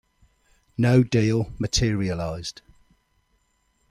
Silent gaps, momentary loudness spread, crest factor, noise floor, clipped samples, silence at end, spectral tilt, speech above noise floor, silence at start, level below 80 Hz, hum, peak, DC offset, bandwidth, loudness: none; 15 LU; 20 dB; -68 dBFS; under 0.1%; 1.4 s; -5.5 dB/octave; 46 dB; 0.8 s; -42 dBFS; none; -6 dBFS; under 0.1%; 12.5 kHz; -23 LUFS